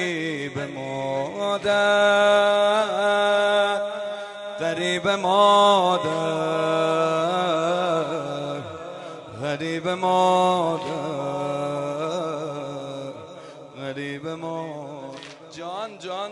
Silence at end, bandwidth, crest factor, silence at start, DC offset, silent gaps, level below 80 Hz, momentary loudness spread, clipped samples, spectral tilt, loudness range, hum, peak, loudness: 0 s; 11.5 kHz; 18 dB; 0 s; under 0.1%; none; -68 dBFS; 18 LU; under 0.1%; -4.5 dB/octave; 11 LU; none; -4 dBFS; -22 LUFS